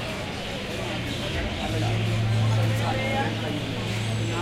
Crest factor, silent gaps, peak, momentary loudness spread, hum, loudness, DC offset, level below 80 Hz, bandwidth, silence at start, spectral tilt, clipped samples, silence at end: 12 dB; none; -14 dBFS; 7 LU; none; -27 LUFS; under 0.1%; -42 dBFS; 14 kHz; 0 s; -5.5 dB/octave; under 0.1%; 0 s